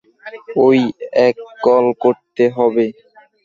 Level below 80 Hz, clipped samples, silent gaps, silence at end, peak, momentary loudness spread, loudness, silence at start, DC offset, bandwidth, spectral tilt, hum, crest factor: -60 dBFS; under 0.1%; none; 0.55 s; 0 dBFS; 9 LU; -15 LUFS; 0.25 s; under 0.1%; 7.2 kHz; -7.5 dB/octave; none; 14 dB